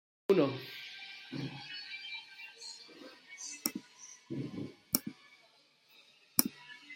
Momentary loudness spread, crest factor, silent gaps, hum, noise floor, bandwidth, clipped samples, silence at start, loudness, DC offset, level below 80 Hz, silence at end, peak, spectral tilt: 20 LU; 36 dB; none; none; -67 dBFS; 16.5 kHz; under 0.1%; 0.3 s; -37 LUFS; under 0.1%; -78 dBFS; 0 s; -4 dBFS; -3.5 dB/octave